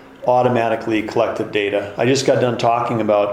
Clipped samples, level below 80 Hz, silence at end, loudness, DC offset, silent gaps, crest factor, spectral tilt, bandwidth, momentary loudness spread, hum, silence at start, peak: under 0.1%; -56 dBFS; 0 s; -18 LUFS; under 0.1%; none; 14 dB; -5.5 dB/octave; 15 kHz; 5 LU; none; 0 s; -2 dBFS